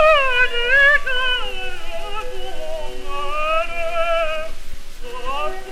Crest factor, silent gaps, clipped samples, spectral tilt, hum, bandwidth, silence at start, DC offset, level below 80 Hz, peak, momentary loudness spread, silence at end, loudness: 16 dB; none; under 0.1%; -2.5 dB/octave; none; 12 kHz; 0 s; under 0.1%; -28 dBFS; -2 dBFS; 18 LU; 0 s; -19 LUFS